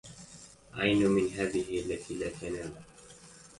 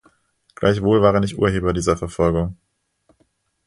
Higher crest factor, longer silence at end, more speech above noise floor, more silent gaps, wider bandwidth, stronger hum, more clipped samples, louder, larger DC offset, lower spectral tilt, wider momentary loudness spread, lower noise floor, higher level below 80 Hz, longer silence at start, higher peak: about the same, 20 dB vs 18 dB; second, 0.15 s vs 1.15 s; second, 23 dB vs 47 dB; neither; about the same, 11.5 kHz vs 11.5 kHz; neither; neither; second, -31 LUFS vs -19 LUFS; neither; second, -5 dB/octave vs -6.5 dB/octave; first, 25 LU vs 6 LU; second, -54 dBFS vs -65 dBFS; second, -56 dBFS vs -38 dBFS; second, 0.05 s vs 0.6 s; second, -12 dBFS vs -2 dBFS